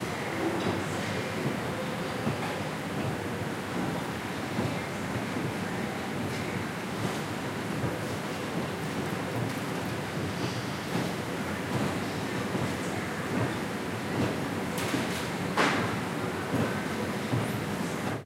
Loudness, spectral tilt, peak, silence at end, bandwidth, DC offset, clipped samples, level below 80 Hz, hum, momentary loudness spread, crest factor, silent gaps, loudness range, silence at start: -32 LUFS; -5 dB/octave; -12 dBFS; 0 s; 16 kHz; under 0.1%; under 0.1%; -58 dBFS; none; 3 LU; 20 dB; none; 3 LU; 0 s